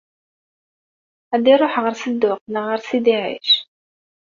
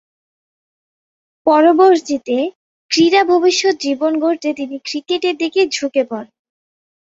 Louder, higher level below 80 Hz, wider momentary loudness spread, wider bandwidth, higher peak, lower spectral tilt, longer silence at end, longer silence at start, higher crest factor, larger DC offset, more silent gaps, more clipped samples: second, -18 LUFS vs -15 LUFS; about the same, -68 dBFS vs -64 dBFS; second, 9 LU vs 12 LU; about the same, 7.4 kHz vs 7.8 kHz; about the same, -2 dBFS vs -2 dBFS; about the same, -4 dB/octave vs -3 dB/octave; second, 0.6 s vs 0.85 s; second, 1.3 s vs 1.45 s; about the same, 18 dB vs 16 dB; neither; second, 2.41-2.46 s vs 2.55-2.89 s; neither